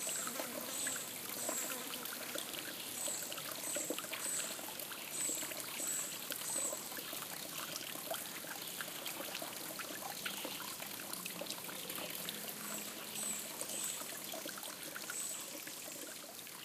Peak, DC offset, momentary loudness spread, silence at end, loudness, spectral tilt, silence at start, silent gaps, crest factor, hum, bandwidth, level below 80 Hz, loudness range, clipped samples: -20 dBFS; under 0.1%; 6 LU; 0 s; -41 LUFS; -0.5 dB/octave; 0 s; none; 22 dB; none; 16 kHz; -84 dBFS; 3 LU; under 0.1%